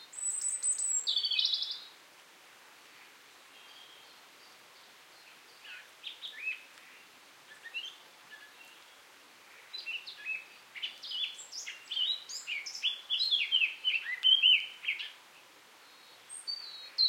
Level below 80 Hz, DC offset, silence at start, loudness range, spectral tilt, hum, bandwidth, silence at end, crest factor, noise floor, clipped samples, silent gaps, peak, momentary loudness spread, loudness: under -90 dBFS; under 0.1%; 0 s; 22 LU; 4.5 dB/octave; none; 16.5 kHz; 0 s; 22 dB; -58 dBFS; under 0.1%; none; -14 dBFS; 25 LU; -31 LUFS